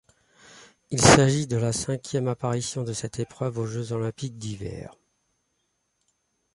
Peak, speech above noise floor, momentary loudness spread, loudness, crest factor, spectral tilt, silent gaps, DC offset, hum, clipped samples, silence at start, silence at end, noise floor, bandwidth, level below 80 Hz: 0 dBFS; 50 dB; 18 LU; -24 LUFS; 26 dB; -4.5 dB/octave; none; under 0.1%; none; under 0.1%; 0.55 s; 1.65 s; -75 dBFS; 11.5 kHz; -48 dBFS